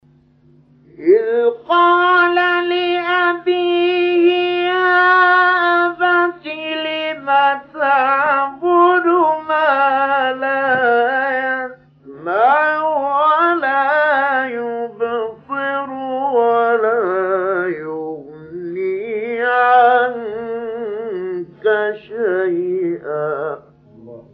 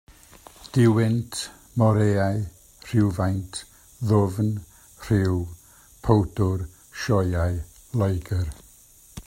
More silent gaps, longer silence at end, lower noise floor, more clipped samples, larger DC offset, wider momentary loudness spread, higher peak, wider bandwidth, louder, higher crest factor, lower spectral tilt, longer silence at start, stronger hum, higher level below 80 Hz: neither; about the same, 0.1 s vs 0.05 s; about the same, -51 dBFS vs -52 dBFS; neither; neither; second, 12 LU vs 16 LU; about the same, -2 dBFS vs -2 dBFS; second, 5.4 kHz vs 15.5 kHz; first, -16 LUFS vs -24 LUFS; second, 14 dB vs 22 dB; about the same, -6.5 dB/octave vs -7 dB/octave; first, 1 s vs 0.6 s; neither; second, -64 dBFS vs -46 dBFS